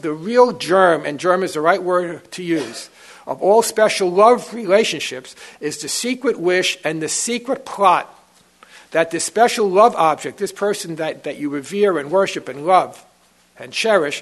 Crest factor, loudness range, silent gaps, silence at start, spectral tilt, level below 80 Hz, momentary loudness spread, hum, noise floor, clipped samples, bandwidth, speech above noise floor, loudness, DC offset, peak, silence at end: 18 dB; 3 LU; none; 0.05 s; -3.5 dB/octave; -68 dBFS; 13 LU; none; -55 dBFS; under 0.1%; 12.5 kHz; 37 dB; -17 LUFS; under 0.1%; 0 dBFS; 0 s